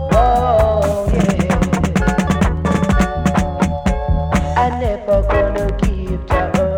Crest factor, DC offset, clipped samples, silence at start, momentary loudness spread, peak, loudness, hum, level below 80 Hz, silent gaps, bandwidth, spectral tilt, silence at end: 12 dB; under 0.1%; under 0.1%; 0 s; 5 LU; -2 dBFS; -16 LUFS; none; -22 dBFS; none; 16.5 kHz; -7 dB/octave; 0 s